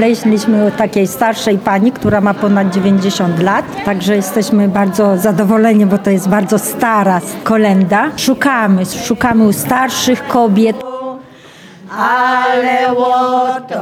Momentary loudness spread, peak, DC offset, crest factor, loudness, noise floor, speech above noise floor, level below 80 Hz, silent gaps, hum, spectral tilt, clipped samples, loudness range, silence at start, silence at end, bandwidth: 4 LU; 0 dBFS; under 0.1%; 10 dB; -12 LUFS; -37 dBFS; 26 dB; -48 dBFS; none; none; -5.5 dB/octave; under 0.1%; 2 LU; 0 s; 0 s; 16.5 kHz